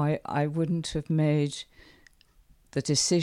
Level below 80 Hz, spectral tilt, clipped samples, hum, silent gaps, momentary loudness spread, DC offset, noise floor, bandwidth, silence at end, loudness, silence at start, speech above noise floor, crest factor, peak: -56 dBFS; -5 dB/octave; under 0.1%; none; none; 10 LU; under 0.1%; -60 dBFS; 12.5 kHz; 0 s; -28 LUFS; 0 s; 33 dB; 16 dB; -12 dBFS